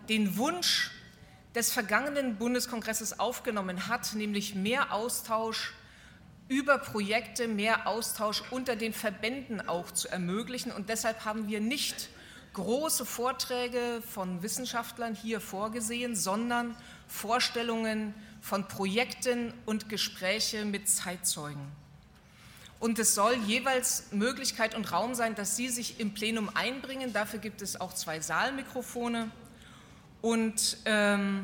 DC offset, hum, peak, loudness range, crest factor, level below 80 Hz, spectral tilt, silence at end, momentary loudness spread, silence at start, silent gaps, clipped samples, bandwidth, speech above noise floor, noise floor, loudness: under 0.1%; none; -12 dBFS; 4 LU; 22 dB; -64 dBFS; -2.5 dB/octave; 0 s; 9 LU; 0 s; none; under 0.1%; 19 kHz; 24 dB; -56 dBFS; -31 LUFS